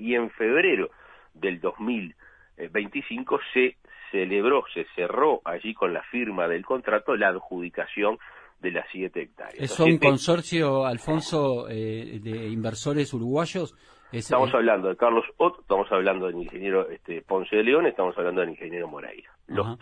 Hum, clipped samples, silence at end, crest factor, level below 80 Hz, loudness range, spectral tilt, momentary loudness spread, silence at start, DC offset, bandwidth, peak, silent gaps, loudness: none; under 0.1%; 0.05 s; 22 dB; -58 dBFS; 4 LU; -5.5 dB/octave; 13 LU; 0 s; under 0.1%; 10.5 kHz; -4 dBFS; none; -25 LUFS